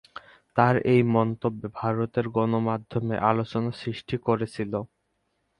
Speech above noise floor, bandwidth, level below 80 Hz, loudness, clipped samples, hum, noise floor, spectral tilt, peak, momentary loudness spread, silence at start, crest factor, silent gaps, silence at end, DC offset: 49 dB; 10.5 kHz; -58 dBFS; -26 LUFS; under 0.1%; none; -74 dBFS; -8.5 dB/octave; -4 dBFS; 11 LU; 0.55 s; 22 dB; none; 0.75 s; under 0.1%